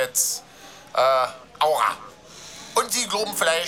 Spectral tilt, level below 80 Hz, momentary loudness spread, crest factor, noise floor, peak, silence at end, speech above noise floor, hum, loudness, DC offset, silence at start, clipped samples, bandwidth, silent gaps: -0.5 dB/octave; -64 dBFS; 20 LU; 16 dB; -44 dBFS; -8 dBFS; 0 s; 22 dB; none; -22 LUFS; under 0.1%; 0 s; under 0.1%; 18 kHz; none